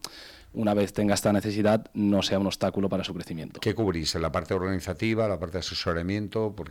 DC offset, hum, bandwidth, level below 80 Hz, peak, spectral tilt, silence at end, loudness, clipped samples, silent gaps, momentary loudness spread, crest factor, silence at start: under 0.1%; none; 17 kHz; -50 dBFS; -10 dBFS; -5.5 dB/octave; 0 s; -27 LUFS; under 0.1%; none; 7 LU; 16 dB; 0.05 s